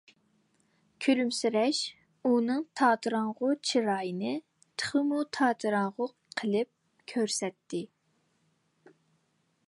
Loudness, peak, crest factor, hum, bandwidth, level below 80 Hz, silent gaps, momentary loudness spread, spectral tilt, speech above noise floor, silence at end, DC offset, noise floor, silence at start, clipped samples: -30 LUFS; -12 dBFS; 20 dB; none; 11.5 kHz; -80 dBFS; none; 11 LU; -4 dB/octave; 45 dB; 1.8 s; under 0.1%; -74 dBFS; 1 s; under 0.1%